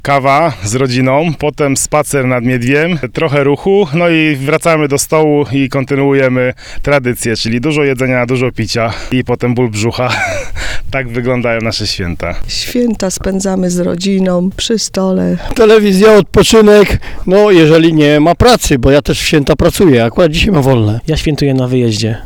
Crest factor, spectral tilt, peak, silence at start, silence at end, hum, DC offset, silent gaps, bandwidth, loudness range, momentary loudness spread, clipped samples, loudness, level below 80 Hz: 10 dB; -5 dB/octave; 0 dBFS; 0.05 s; 0 s; none; under 0.1%; none; 19 kHz; 7 LU; 9 LU; under 0.1%; -11 LUFS; -28 dBFS